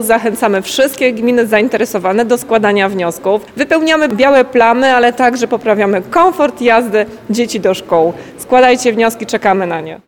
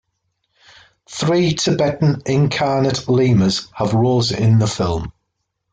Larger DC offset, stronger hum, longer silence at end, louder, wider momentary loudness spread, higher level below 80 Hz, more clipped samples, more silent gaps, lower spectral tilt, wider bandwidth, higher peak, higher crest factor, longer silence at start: neither; neither; second, 0.1 s vs 0.6 s; first, -12 LUFS vs -17 LUFS; about the same, 7 LU vs 7 LU; second, -50 dBFS vs -44 dBFS; neither; neither; second, -4 dB/octave vs -6 dB/octave; first, 19.5 kHz vs 9.2 kHz; first, 0 dBFS vs -4 dBFS; about the same, 10 dB vs 12 dB; second, 0 s vs 1.1 s